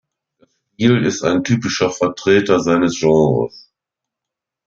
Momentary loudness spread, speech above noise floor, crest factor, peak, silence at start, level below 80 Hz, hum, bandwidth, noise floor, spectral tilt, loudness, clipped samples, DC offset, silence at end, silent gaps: 5 LU; 69 dB; 16 dB; -2 dBFS; 0.8 s; -52 dBFS; none; 7.6 kHz; -84 dBFS; -5.5 dB/octave; -16 LUFS; under 0.1%; under 0.1%; 1.1 s; none